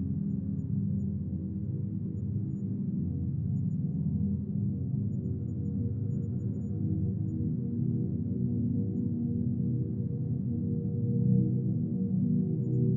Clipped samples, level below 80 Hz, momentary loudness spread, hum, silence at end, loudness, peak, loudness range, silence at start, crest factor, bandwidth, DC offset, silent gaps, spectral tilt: under 0.1%; -58 dBFS; 5 LU; none; 0 s; -32 LUFS; -16 dBFS; 3 LU; 0 s; 16 dB; 1.3 kHz; under 0.1%; none; -14.5 dB/octave